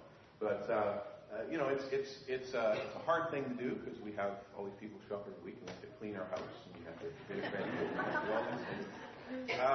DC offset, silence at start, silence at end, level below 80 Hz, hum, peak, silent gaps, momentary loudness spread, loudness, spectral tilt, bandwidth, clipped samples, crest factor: under 0.1%; 0 s; 0 s; -74 dBFS; none; -20 dBFS; none; 13 LU; -40 LUFS; -4 dB/octave; 6.2 kHz; under 0.1%; 20 dB